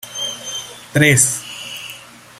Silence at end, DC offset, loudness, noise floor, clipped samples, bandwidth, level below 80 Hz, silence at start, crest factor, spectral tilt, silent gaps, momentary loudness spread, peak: 0 s; under 0.1%; -16 LUFS; -38 dBFS; under 0.1%; 16 kHz; -54 dBFS; 0.05 s; 20 dB; -3 dB/octave; none; 19 LU; 0 dBFS